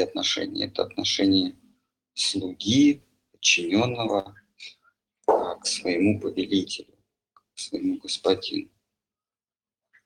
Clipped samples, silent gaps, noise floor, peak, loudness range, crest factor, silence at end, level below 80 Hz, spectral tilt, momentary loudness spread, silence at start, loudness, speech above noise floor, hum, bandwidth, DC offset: under 0.1%; none; under -90 dBFS; -6 dBFS; 6 LU; 20 dB; 1.4 s; -64 dBFS; -3.5 dB/octave; 16 LU; 0 s; -25 LUFS; over 65 dB; none; 11 kHz; under 0.1%